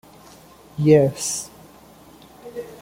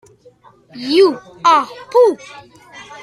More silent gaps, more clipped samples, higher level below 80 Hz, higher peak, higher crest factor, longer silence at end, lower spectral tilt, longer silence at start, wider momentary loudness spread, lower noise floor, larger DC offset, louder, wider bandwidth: neither; neither; first, -56 dBFS vs -64 dBFS; about the same, -2 dBFS vs -2 dBFS; first, 22 dB vs 16 dB; about the same, 0.05 s vs 0 s; first, -5.5 dB/octave vs -3.5 dB/octave; about the same, 0.75 s vs 0.75 s; first, 22 LU vs 16 LU; about the same, -47 dBFS vs -47 dBFS; neither; second, -19 LUFS vs -14 LUFS; first, 16.5 kHz vs 12 kHz